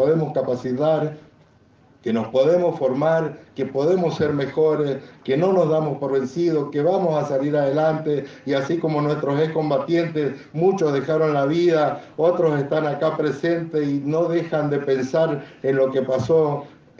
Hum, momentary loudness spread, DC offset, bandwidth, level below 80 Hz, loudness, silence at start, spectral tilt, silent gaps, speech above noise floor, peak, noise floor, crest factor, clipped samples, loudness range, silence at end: none; 6 LU; under 0.1%; 7.4 kHz; -62 dBFS; -21 LUFS; 0 s; -7.5 dB/octave; none; 34 dB; -6 dBFS; -54 dBFS; 14 dB; under 0.1%; 2 LU; 0.3 s